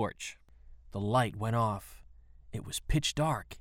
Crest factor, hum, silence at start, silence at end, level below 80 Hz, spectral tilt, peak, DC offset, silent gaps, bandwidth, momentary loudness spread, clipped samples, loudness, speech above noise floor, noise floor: 18 dB; none; 0 s; 0 s; -46 dBFS; -5 dB/octave; -16 dBFS; under 0.1%; none; 16.5 kHz; 14 LU; under 0.1%; -33 LUFS; 22 dB; -54 dBFS